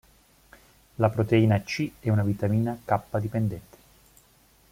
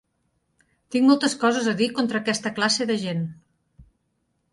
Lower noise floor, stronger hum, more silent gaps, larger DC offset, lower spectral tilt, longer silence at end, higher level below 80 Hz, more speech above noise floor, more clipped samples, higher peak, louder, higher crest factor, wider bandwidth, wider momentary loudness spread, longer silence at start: second, -60 dBFS vs -72 dBFS; neither; neither; neither; first, -7.5 dB/octave vs -4 dB/octave; first, 1.1 s vs 0.7 s; first, -56 dBFS vs -64 dBFS; second, 35 dB vs 50 dB; neither; about the same, -8 dBFS vs -6 dBFS; second, -26 LUFS vs -22 LUFS; about the same, 20 dB vs 18 dB; first, 16 kHz vs 11.5 kHz; about the same, 9 LU vs 10 LU; about the same, 1 s vs 0.9 s